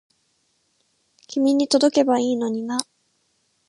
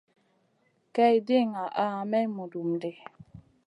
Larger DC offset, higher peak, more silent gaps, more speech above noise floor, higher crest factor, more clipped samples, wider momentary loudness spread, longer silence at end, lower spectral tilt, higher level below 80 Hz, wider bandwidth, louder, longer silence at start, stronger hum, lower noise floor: neither; first, 0 dBFS vs -10 dBFS; neither; first, 49 dB vs 43 dB; about the same, 22 dB vs 18 dB; neither; second, 11 LU vs 14 LU; first, 0.85 s vs 0.25 s; second, -3.5 dB/octave vs -7.5 dB/octave; about the same, -76 dBFS vs -72 dBFS; about the same, 11.5 kHz vs 11 kHz; first, -21 LUFS vs -27 LUFS; first, 1.3 s vs 0.95 s; neither; about the same, -68 dBFS vs -70 dBFS